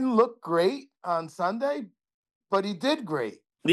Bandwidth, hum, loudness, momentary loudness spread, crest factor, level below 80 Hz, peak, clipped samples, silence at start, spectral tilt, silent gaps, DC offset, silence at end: 12.5 kHz; none; -28 LUFS; 10 LU; 18 dB; -78 dBFS; -8 dBFS; under 0.1%; 0 s; -5.5 dB/octave; 2.14-2.23 s, 2.35-2.41 s; under 0.1%; 0 s